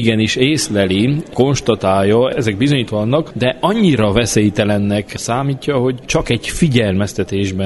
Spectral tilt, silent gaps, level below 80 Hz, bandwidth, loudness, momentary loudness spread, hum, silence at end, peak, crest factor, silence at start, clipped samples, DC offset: -5.5 dB/octave; none; -38 dBFS; 12 kHz; -15 LUFS; 5 LU; none; 0 s; 0 dBFS; 14 dB; 0 s; under 0.1%; under 0.1%